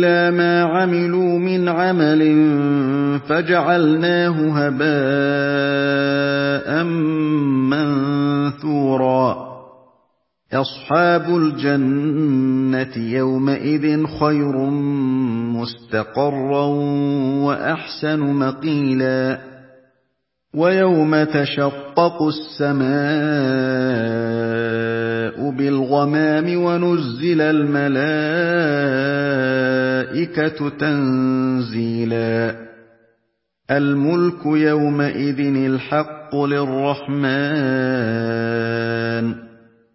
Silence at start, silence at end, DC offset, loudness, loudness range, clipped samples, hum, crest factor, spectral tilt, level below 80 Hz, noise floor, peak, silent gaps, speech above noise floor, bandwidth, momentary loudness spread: 0 s; 0.45 s; under 0.1%; -18 LUFS; 4 LU; under 0.1%; none; 18 dB; -11 dB/octave; -58 dBFS; -72 dBFS; 0 dBFS; none; 54 dB; 5.8 kHz; 6 LU